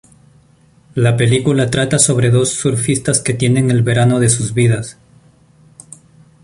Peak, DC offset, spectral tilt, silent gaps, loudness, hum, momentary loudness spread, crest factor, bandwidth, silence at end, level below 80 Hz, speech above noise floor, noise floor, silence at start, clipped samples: 0 dBFS; under 0.1%; -5 dB/octave; none; -14 LUFS; none; 4 LU; 16 dB; 11.5 kHz; 1.5 s; -44 dBFS; 36 dB; -50 dBFS; 0.95 s; under 0.1%